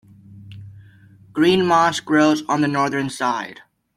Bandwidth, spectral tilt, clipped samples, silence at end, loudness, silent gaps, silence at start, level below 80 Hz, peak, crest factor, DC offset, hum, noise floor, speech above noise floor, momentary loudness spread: 13.5 kHz; -5 dB/octave; under 0.1%; 0.45 s; -18 LUFS; none; 0.3 s; -60 dBFS; -4 dBFS; 16 dB; under 0.1%; none; -48 dBFS; 30 dB; 17 LU